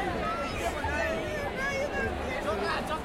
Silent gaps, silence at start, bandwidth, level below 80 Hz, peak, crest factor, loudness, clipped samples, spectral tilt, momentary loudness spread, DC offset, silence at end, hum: none; 0 s; 16.5 kHz; -44 dBFS; -18 dBFS; 14 dB; -31 LUFS; under 0.1%; -4.5 dB/octave; 2 LU; under 0.1%; 0 s; none